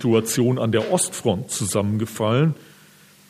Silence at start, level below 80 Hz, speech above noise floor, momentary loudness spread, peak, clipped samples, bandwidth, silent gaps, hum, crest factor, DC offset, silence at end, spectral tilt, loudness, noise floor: 0 s; -64 dBFS; 30 dB; 4 LU; -6 dBFS; under 0.1%; 15.5 kHz; none; none; 16 dB; under 0.1%; 0.65 s; -5 dB/octave; -21 LUFS; -51 dBFS